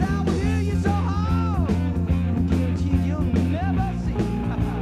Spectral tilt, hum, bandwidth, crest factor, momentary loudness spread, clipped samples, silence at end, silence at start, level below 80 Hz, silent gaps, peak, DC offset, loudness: -8 dB/octave; none; 10 kHz; 12 dB; 3 LU; under 0.1%; 0 s; 0 s; -30 dBFS; none; -10 dBFS; under 0.1%; -23 LUFS